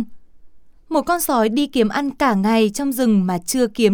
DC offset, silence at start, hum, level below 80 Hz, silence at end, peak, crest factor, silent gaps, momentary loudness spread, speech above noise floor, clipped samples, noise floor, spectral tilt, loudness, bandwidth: under 0.1%; 0 s; none; -50 dBFS; 0 s; -2 dBFS; 16 dB; none; 4 LU; 28 dB; under 0.1%; -46 dBFS; -5 dB/octave; -18 LUFS; 19.5 kHz